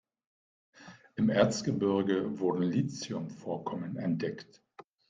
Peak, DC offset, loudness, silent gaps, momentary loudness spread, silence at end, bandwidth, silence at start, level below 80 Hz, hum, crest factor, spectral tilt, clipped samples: -12 dBFS; under 0.1%; -31 LUFS; none; 11 LU; 0.65 s; 9.4 kHz; 0.8 s; -68 dBFS; none; 22 dB; -6 dB/octave; under 0.1%